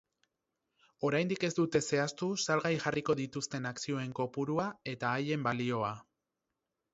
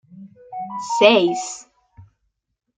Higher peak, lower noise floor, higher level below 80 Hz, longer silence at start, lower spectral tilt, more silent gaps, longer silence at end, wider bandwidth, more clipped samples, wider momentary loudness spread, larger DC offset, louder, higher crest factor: second, -16 dBFS vs -2 dBFS; first, -87 dBFS vs -75 dBFS; about the same, -70 dBFS vs -66 dBFS; first, 1 s vs 0.15 s; first, -4.5 dB/octave vs -3 dB/octave; neither; first, 0.9 s vs 0.75 s; second, 8 kHz vs 9.6 kHz; neither; second, 7 LU vs 21 LU; neither; second, -34 LUFS vs -17 LUFS; about the same, 20 dB vs 20 dB